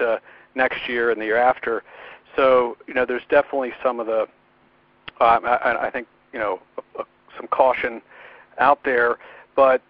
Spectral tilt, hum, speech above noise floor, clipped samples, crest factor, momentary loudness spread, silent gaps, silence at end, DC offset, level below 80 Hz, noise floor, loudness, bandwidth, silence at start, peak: -1.5 dB/octave; none; 37 dB; under 0.1%; 20 dB; 18 LU; none; 0.1 s; under 0.1%; -58 dBFS; -58 dBFS; -21 LUFS; 5.2 kHz; 0 s; 0 dBFS